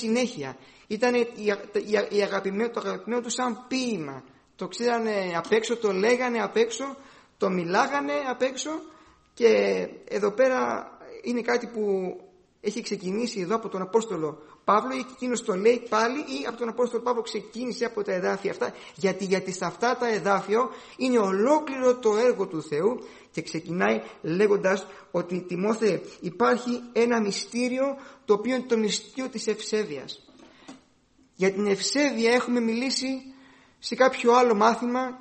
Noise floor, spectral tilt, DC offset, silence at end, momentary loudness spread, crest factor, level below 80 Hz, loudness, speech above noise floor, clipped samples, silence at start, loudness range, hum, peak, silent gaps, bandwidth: -62 dBFS; -4.5 dB/octave; under 0.1%; 0 s; 11 LU; 20 dB; -70 dBFS; -26 LUFS; 36 dB; under 0.1%; 0 s; 4 LU; none; -6 dBFS; none; 8.8 kHz